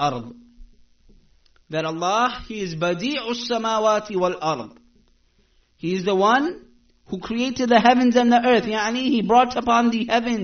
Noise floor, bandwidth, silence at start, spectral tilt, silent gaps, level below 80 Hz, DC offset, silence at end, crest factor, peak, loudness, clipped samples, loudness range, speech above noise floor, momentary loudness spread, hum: -61 dBFS; 6.6 kHz; 0 s; -3 dB/octave; none; -52 dBFS; under 0.1%; 0 s; 20 dB; -2 dBFS; -20 LUFS; under 0.1%; 7 LU; 41 dB; 14 LU; none